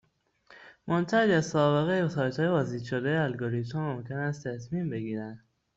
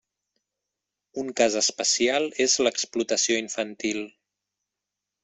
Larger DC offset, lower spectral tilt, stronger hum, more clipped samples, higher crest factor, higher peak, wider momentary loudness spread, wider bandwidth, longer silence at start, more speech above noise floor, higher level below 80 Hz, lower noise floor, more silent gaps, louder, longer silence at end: neither; first, -6.5 dB/octave vs -1 dB/octave; second, none vs 50 Hz at -70 dBFS; neither; about the same, 18 dB vs 22 dB; second, -12 dBFS vs -6 dBFS; about the same, 10 LU vs 12 LU; about the same, 7.8 kHz vs 8.4 kHz; second, 0.5 s vs 1.15 s; second, 35 dB vs 61 dB; about the same, -64 dBFS vs -68 dBFS; second, -63 dBFS vs -86 dBFS; neither; second, -29 LUFS vs -24 LUFS; second, 0.4 s vs 1.15 s